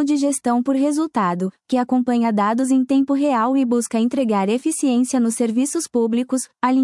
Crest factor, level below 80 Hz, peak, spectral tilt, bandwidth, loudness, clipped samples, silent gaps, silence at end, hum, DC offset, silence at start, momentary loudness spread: 12 dB; -70 dBFS; -6 dBFS; -5 dB/octave; 12 kHz; -19 LUFS; under 0.1%; none; 0 s; none; under 0.1%; 0 s; 3 LU